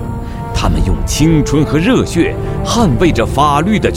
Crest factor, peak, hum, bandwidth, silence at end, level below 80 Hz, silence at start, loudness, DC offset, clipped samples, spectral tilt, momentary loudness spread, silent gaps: 12 dB; 0 dBFS; none; 16.5 kHz; 0 s; -20 dBFS; 0 s; -13 LUFS; under 0.1%; under 0.1%; -6 dB/octave; 7 LU; none